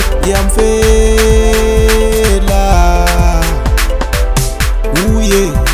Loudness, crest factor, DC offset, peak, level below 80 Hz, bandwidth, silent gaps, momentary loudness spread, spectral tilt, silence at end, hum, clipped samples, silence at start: -11 LUFS; 10 dB; under 0.1%; 0 dBFS; -12 dBFS; 16 kHz; none; 5 LU; -4.5 dB/octave; 0 s; none; 0.3%; 0 s